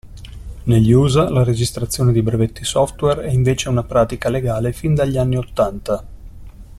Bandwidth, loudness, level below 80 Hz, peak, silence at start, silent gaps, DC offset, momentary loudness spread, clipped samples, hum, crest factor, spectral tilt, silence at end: 13.5 kHz; -17 LUFS; -34 dBFS; -2 dBFS; 0.05 s; none; under 0.1%; 11 LU; under 0.1%; none; 16 dB; -6.5 dB/octave; 0.05 s